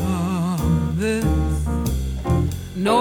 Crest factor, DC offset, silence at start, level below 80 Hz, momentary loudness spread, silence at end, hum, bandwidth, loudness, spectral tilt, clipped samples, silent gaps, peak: 16 dB; under 0.1%; 0 s; -26 dBFS; 4 LU; 0 s; none; 18 kHz; -22 LUFS; -6.5 dB/octave; under 0.1%; none; -4 dBFS